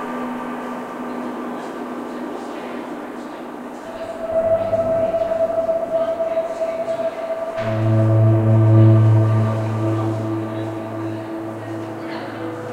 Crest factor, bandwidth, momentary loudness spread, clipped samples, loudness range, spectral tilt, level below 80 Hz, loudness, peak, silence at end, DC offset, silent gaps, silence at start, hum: 16 dB; 8.2 kHz; 14 LU; under 0.1%; 12 LU; -9 dB/octave; -50 dBFS; -20 LUFS; -4 dBFS; 0 s; under 0.1%; none; 0 s; none